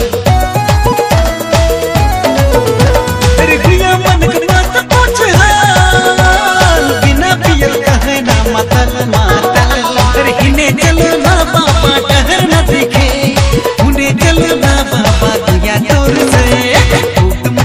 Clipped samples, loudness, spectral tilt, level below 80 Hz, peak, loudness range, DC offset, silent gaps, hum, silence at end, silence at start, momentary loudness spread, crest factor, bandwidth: 2%; -9 LUFS; -4.5 dB/octave; -16 dBFS; 0 dBFS; 2 LU; under 0.1%; none; none; 0 s; 0 s; 3 LU; 8 dB; 16.5 kHz